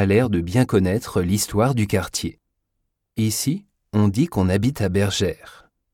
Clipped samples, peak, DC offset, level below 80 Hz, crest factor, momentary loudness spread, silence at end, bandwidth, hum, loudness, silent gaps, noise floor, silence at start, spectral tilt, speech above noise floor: under 0.1%; -4 dBFS; under 0.1%; -46 dBFS; 16 dB; 8 LU; 0.45 s; 17 kHz; none; -21 LUFS; none; -75 dBFS; 0 s; -5.5 dB/octave; 55 dB